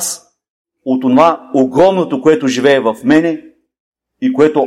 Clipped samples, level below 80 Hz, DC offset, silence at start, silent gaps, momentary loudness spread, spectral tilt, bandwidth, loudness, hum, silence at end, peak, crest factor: under 0.1%; -54 dBFS; under 0.1%; 0 s; 0.49-0.65 s, 3.80-3.92 s; 10 LU; -5 dB/octave; 15.5 kHz; -12 LUFS; none; 0 s; 0 dBFS; 12 dB